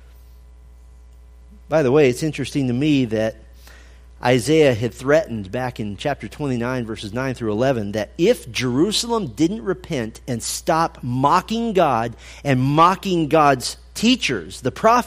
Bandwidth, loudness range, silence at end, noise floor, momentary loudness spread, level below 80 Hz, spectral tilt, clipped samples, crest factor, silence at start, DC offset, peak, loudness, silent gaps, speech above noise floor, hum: 15.5 kHz; 4 LU; 0 s; -44 dBFS; 11 LU; -44 dBFS; -5 dB/octave; under 0.1%; 18 dB; 1.5 s; under 0.1%; -2 dBFS; -20 LUFS; none; 25 dB; none